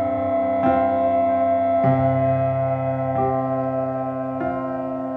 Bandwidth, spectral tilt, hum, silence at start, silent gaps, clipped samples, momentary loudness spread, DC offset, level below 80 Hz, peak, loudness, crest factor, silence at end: 4 kHz; -11 dB/octave; none; 0 s; none; under 0.1%; 7 LU; under 0.1%; -52 dBFS; -8 dBFS; -21 LUFS; 14 dB; 0 s